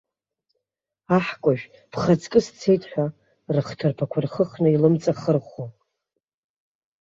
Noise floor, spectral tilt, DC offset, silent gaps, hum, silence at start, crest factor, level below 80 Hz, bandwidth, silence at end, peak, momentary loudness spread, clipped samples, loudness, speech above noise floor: -83 dBFS; -7.5 dB/octave; under 0.1%; none; none; 1.1 s; 20 dB; -60 dBFS; 7.8 kHz; 1.3 s; -4 dBFS; 10 LU; under 0.1%; -23 LUFS; 62 dB